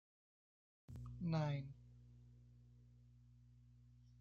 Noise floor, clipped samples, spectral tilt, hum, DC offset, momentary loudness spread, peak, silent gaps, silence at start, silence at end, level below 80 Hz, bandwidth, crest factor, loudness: -66 dBFS; under 0.1%; -7.5 dB/octave; 60 Hz at -60 dBFS; under 0.1%; 26 LU; -30 dBFS; none; 0.9 s; 0.25 s; -68 dBFS; 7 kHz; 20 dB; -45 LUFS